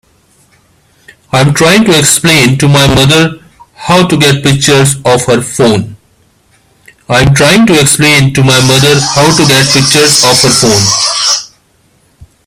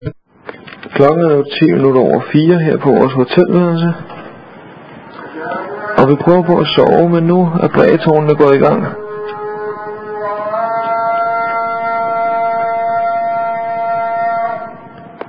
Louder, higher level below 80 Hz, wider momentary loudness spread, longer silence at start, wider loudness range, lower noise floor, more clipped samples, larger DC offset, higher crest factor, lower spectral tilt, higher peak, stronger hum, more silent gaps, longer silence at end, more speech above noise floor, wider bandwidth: first, -6 LUFS vs -13 LUFS; first, -34 dBFS vs -48 dBFS; second, 5 LU vs 15 LU; first, 1.35 s vs 0 s; about the same, 4 LU vs 6 LU; first, -49 dBFS vs -35 dBFS; first, 0.8% vs 0.3%; second, under 0.1% vs 0.4%; second, 8 dB vs 14 dB; second, -3.5 dB/octave vs -9.5 dB/octave; about the same, 0 dBFS vs 0 dBFS; neither; neither; first, 1 s vs 0 s; first, 43 dB vs 25 dB; first, over 20 kHz vs 5.2 kHz